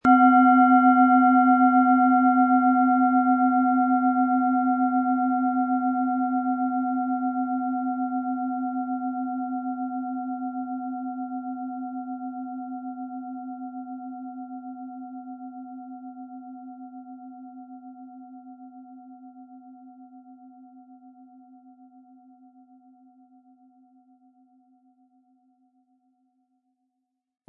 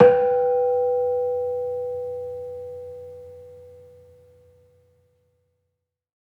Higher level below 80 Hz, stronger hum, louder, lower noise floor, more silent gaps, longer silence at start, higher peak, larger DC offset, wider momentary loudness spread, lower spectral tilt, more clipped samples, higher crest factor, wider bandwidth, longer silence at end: second, -74 dBFS vs -68 dBFS; neither; about the same, -22 LUFS vs -23 LUFS; about the same, -80 dBFS vs -80 dBFS; neither; about the same, 0.05 s vs 0 s; second, -6 dBFS vs -2 dBFS; neither; first, 25 LU vs 22 LU; about the same, -8.5 dB/octave vs -8.5 dB/octave; neither; second, 18 dB vs 24 dB; about the same, 3.2 kHz vs 3.5 kHz; first, 6.55 s vs 2.5 s